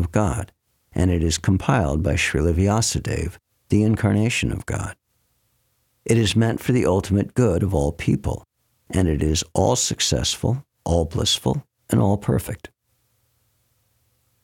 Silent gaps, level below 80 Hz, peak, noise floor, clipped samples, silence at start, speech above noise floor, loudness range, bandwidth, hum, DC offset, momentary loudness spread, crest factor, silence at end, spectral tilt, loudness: none; -36 dBFS; -4 dBFS; -68 dBFS; under 0.1%; 0 s; 48 dB; 3 LU; 17 kHz; none; under 0.1%; 10 LU; 18 dB; 1.75 s; -5 dB/octave; -21 LUFS